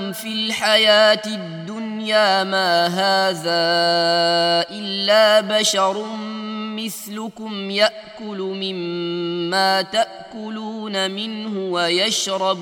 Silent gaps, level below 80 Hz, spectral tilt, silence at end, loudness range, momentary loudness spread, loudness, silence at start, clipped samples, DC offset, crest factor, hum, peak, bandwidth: none; -70 dBFS; -3 dB/octave; 0 s; 6 LU; 14 LU; -18 LUFS; 0 s; under 0.1%; under 0.1%; 20 dB; none; 0 dBFS; 16 kHz